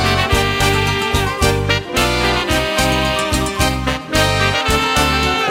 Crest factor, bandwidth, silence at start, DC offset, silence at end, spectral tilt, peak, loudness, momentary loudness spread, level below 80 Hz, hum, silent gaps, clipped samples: 16 dB; 16.5 kHz; 0 s; under 0.1%; 0 s; -4 dB/octave; 0 dBFS; -15 LUFS; 3 LU; -26 dBFS; none; none; under 0.1%